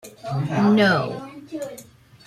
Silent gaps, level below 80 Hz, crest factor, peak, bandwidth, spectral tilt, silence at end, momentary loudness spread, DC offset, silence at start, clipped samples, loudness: none; -60 dBFS; 18 dB; -6 dBFS; 13.5 kHz; -6.5 dB/octave; 0.45 s; 19 LU; under 0.1%; 0.05 s; under 0.1%; -20 LUFS